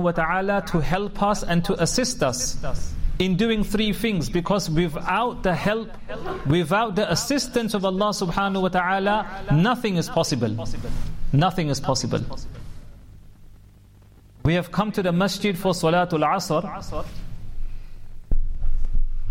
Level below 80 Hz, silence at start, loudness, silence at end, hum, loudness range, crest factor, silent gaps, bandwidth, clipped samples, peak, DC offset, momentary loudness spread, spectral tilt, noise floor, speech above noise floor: -30 dBFS; 0 s; -23 LUFS; 0 s; none; 5 LU; 14 dB; none; 16.5 kHz; under 0.1%; -10 dBFS; under 0.1%; 12 LU; -5 dB/octave; -49 dBFS; 27 dB